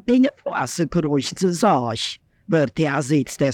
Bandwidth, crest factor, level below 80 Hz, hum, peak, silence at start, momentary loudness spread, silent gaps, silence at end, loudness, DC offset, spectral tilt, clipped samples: 16.5 kHz; 16 dB; -52 dBFS; none; -4 dBFS; 0.05 s; 7 LU; none; 0 s; -21 LUFS; under 0.1%; -5.5 dB/octave; under 0.1%